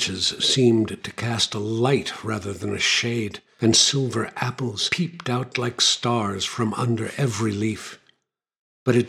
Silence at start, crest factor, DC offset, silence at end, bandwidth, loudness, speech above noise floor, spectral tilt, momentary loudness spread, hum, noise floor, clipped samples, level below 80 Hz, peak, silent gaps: 0 s; 20 dB; under 0.1%; 0 s; 14 kHz; -22 LUFS; 52 dB; -3.5 dB/octave; 10 LU; none; -75 dBFS; under 0.1%; -60 dBFS; -4 dBFS; 8.59-8.86 s